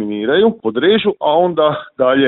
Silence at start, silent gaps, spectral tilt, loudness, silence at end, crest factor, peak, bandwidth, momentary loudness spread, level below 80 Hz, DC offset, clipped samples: 0 s; none; -10.5 dB/octave; -14 LUFS; 0 s; 14 dB; 0 dBFS; 4.1 kHz; 3 LU; -56 dBFS; under 0.1%; under 0.1%